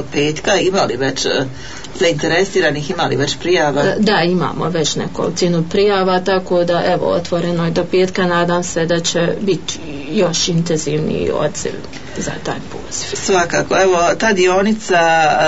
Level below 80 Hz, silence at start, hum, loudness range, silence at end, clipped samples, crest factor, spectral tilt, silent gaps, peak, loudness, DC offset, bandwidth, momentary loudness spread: -44 dBFS; 0 s; none; 3 LU; 0 s; under 0.1%; 12 dB; -4.5 dB/octave; none; -2 dBFS; -16 LUFS; 3%; 8 kHz; 10 LU